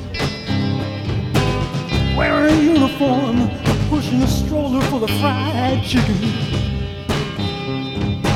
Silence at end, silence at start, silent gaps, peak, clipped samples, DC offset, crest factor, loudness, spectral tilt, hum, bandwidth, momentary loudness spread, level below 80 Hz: 0 s; 0 s; none; -2 dBFS; under 0.1%; under 0.1%; 14 dB; -18 LUFS; -6 dB/octave; none; 16.5 kHz; 8 LU; -30 dBFS